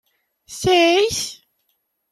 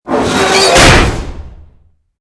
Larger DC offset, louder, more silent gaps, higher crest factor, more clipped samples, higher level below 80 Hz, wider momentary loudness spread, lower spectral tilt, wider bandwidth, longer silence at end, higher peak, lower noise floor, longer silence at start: neither; second, -17 LUFS vs -7 LUFS; neither; first, 18 dB vs 10 dB; second, under 0.1% vs 1%; second, -52 dBFS vs -20 dBFS; about the same, 15 LU vs 17 LU; about the same, -3 dB/octave vs -3.5 dB/octave; first, 15.5 kHz vs 11 kHz; about the same, 0.75 s vs 0.65 s; second, -4 dBFS vs 0 dBFS; first, -71 dBFS vs -47 dBFS; first, 0.5 s vs 0.05 s